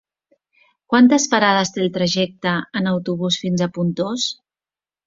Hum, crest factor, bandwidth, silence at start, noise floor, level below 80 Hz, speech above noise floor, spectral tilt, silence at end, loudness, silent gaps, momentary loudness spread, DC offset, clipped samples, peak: none; 18 dB; 7.8 kHz; 0.9 s; under -90 dBFS; -60 dBFS; over 72 dB; -4.5 dB/octave; 0.75 s; -18 LUFS; none; 9 LU; under 0.1%; under 0.1%; -2 dBFS